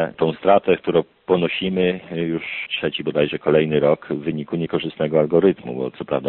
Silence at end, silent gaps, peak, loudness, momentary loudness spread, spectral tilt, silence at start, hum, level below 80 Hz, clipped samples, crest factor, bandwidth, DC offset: 0 s; none; -2 dBFS; -20 LUFS; 9 LU; -4.5 dB/octave; 0 s; none; -54 dBFS; under 0.1%; 18 dB; 4.3 kHz; under 0.1%